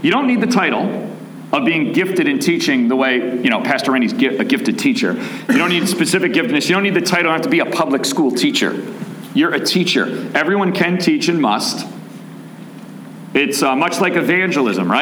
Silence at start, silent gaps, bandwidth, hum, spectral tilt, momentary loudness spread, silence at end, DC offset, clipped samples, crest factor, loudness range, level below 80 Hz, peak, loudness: 0 s; none; over 20 kHz; none; -4.5 dB/octave; 14 LU; 0 s; under 0.1%; under 0.1%; 16 dB; 3 LU; -66 dBFS; -2 dBFS; -16 LUFS